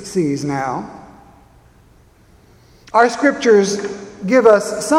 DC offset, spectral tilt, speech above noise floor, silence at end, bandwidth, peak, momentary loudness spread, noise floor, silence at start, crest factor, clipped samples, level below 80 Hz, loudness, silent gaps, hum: under 0.1%; -5 dB/octave; 35 dB; 0 s; 15.5 kHz; 0 dBFS; 16 LU; -49 dBFS; 0 s; 18 dB; under 0.1%; -54 dBFS; -15 LUFS; none; none